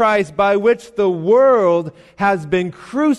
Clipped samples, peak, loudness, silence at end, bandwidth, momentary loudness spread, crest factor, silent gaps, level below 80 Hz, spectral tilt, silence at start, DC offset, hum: under 0.1%; -4 dBFS; -16 LUFS; 0 s; 11.5 kHz; 8 LU; 12 dB; none; -52 dBFS; -6.5 dB/octave; 0 s; under 0.1%; none